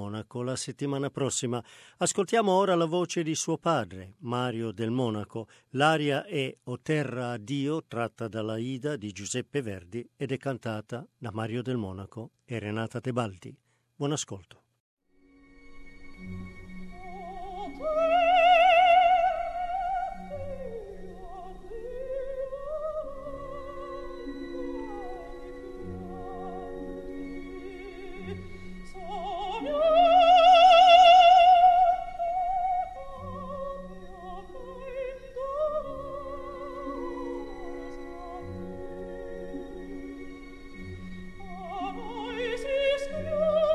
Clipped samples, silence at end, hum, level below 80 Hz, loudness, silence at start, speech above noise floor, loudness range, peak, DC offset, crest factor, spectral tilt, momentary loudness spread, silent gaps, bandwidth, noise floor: under 0.1%; 0 s; none; -52 dBFS; -25 LUFS; 0 s; 29 dB; 21 LU; -6 dBFS; under 0.1%; 22 dB; -4.5 dB/octave; 23 LU; 14.80-14.97 s; 11.5 kHz; -60 dBFS